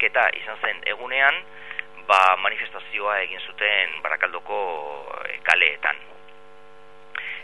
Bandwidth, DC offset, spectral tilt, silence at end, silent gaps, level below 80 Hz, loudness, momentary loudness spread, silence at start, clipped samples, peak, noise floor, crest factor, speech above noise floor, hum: 11.5 kHz; 0.8%; -1 dB/octave; 0 s; none; -68 dBFS; -22 LUFS; 16 LU; 0 s; under 0.1%; 0 dBFS; -49 dBFS; 24 dB; 26 dB; none